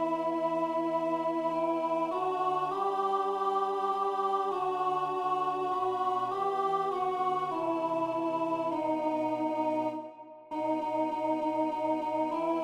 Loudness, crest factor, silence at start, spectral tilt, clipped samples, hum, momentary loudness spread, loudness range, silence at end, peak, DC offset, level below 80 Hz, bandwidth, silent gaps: -31 LUFS; 12 dB; 0 s; -6 dB/octave; under 0.1%; none; 2 LU; 2 LU; 0 s; -18 dBFS; under 0.1%; -76 dBFS; 12 kHz; none